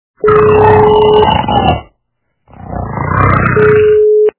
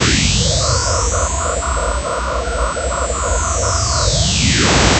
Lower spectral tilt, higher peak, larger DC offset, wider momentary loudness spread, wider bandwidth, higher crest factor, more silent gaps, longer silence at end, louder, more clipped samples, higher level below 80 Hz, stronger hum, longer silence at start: first, -10.5 dB/octave vs -3 dB/octave; about the same, 0 dBFS vs 0 dBFS; neither; first, 13 LU vs 7 LU; second, 4 kHz vs 8.4 kHz; second, 10 dB vs 16 dB; neither; about the same, 0.1 s vs 0 s; first, -8 LUFS vs -16 LUFS; first, 0.9% vs under 0.1%; about the same, -26 dBFS vs -22 dBFS; neither; first, 0.25 s vs 0 s